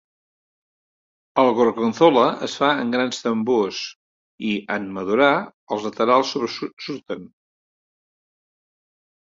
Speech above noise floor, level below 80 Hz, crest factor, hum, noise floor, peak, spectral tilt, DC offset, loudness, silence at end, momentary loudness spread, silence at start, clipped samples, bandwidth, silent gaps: over 70 dB; -66 dBFS; 20 dB; none; under -90 dBFS; -2 dBFS; -5 dB/octave; under 0.1%; -20 LUFS; 1.95 s; 13 LU; 1.35 s; under 0.1%; 7.8 kHz; 3.96-4.38 s, 5.53-5.67 s, 6.73-6.77 s